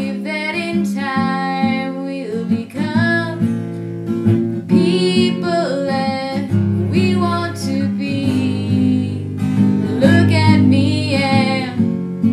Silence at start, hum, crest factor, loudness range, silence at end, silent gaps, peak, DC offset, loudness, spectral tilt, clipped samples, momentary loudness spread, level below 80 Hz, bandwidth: 0 s; none; 16 dB; 4 LU; 0 s; none; 0 dBFS; under 0.1%; -17 LUFS; -7 dB/octave; under 0.1%; 9 LU; -56 dBFS; 12.5 kHz